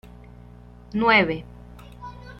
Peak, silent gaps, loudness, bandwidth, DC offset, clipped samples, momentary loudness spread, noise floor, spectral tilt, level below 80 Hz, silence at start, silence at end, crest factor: -4 dBFS; none; -21 LUFS; 9.8 kHz; under 0.1%; under 0.1%; 24 LU; -45 dBFS; -6.5 dB/octave; -46 dBFS; 0.9 s; 0.05 s; 22 dB